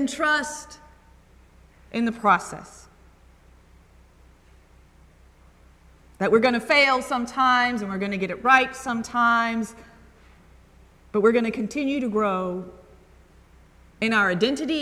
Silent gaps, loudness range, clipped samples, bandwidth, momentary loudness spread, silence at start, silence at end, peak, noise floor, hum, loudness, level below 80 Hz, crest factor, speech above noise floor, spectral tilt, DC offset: none; 8 LU; under 0.1%; 13.5 kHz; 15 LU; 0 s; 0 s; -4 dBFS; -53 dBFS; none; -22 LUFS; -54 dBFS; 22 dB; 31 dB; -4 dB/octave; under 0.1%